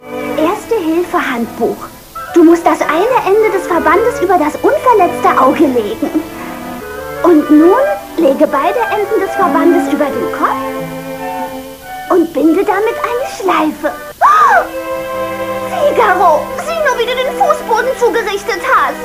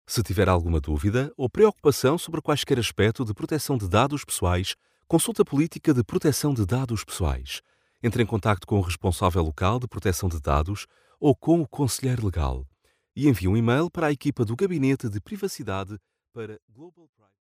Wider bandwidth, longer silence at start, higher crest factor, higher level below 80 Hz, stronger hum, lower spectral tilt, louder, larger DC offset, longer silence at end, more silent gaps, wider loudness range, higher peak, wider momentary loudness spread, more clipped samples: about the same, 16 kHz vs 16 kHz; about the same, 0 s vs 0.1 s; second, 12 dB vs 18 dB; about the same, -44 dBFS vs -40 dBFS; neither; second, -4.5 dB/octave vs -6 dB/octave; first, -12 LUFS vs -25 LUFS; neither; second, 0 s vs 0.6 s; second, none vs 16.62-16.68 s; about the same, 4 LU vs 3 LU; first, 0 dBFS vs -6 dBFS; first, 13 LU vs 10 LU; first, 0.1% vs under 0.1%